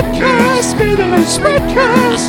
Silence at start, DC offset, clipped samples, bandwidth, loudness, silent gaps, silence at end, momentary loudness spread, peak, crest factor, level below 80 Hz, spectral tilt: 0 s; under 0.1%; 0.2%; 18.5 kHz; -11 LUFS; none; 0 s; 2 LU; 0 dBFS; 12 dB; -28 dBFS; -4.5 dB/octave